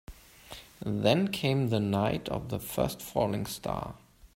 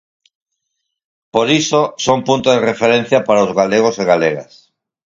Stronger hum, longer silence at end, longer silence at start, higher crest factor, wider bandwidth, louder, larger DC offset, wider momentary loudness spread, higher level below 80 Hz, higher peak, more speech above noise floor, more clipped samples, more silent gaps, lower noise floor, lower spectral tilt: neither; second, 0.1 s vs 0.65 s; second, 0.1 s vs 1.35 s; first, 22 dB vs 16 dB; first, 16 kHz vs 7.8 kHz; second, -30 LUFS vs -14 LUFS; neither; first, 15 LU vs 4 LU; about the same, -52 dBFS vs -56 dBFS; second, -10 dBFS vs 0 dBFS; second, 20 dB vs 61 dB; neither; neither; second, -50 dBFS vs -74 dBFS; first, -6 dB/octave vs -4.5 dB/octave